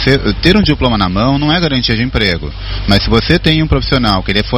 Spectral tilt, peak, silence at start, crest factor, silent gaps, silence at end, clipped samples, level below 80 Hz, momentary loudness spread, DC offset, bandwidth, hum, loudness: -6.5 dB/octave; 0 dBFS; 0 s; 12 dB; none; 0 s; 0.5%; -22 dBFS; 3 LU; under 0.1%; 14.5 kHz; none; -12 LUFS